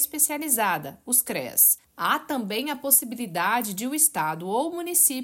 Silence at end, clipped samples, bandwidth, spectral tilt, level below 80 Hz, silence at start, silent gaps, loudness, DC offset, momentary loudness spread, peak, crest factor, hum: 0 s; under 0.1%; 17 kHz; -1.5 dB/octave; -70 dBFS; 0 s; none; -22 LUFS; under 0.1%; 10 LU; -4 dBFS; 20 dB; none